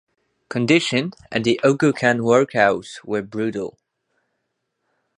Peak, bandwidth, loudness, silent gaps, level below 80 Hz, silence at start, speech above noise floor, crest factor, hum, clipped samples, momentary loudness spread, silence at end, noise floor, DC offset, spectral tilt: -2 dBFS; 11 kHz; -19 LUFS; none; -60 dBFS; 0.5 s; 56 dB; 20 dB; none; under 0.1%; 11 LU; 1.45 s; -75 dBFS; under 0.1%; -5.5 dB/octave